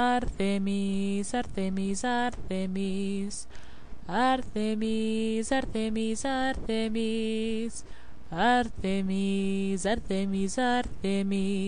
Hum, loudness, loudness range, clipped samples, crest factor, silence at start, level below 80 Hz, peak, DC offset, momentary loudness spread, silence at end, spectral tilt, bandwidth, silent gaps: none; -29 LUFS; 2 LU; under 0.1%; 14 dB; 0 s; -46 dBFS; -14 dBFS; 2%; 6 LU; 0 s; -5 dB/octave; 10.5 kHz; none